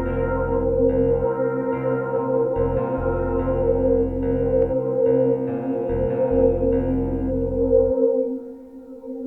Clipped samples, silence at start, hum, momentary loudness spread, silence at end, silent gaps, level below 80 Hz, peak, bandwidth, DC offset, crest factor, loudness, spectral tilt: under 0.1%; 0 s; none; 6 LU; 0 s; none; -34 dBFS; -6 dBFS; 3.1 kHz; under 0.1%; 16 dB; -21 LUFS; -12 dB/octave